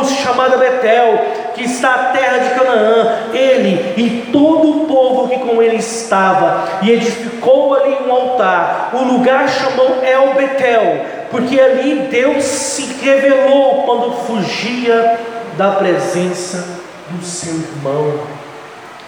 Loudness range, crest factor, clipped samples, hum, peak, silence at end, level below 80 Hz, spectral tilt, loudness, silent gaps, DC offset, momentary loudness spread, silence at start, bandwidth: 4 LU; 12 dB; under 0.1%; none; 0 dBFS; 0 s; -62 dBFS; -4.5 dB/octave; -13 LUFS; none; under 0.1%; 10 LU; 0 s; 17 kHz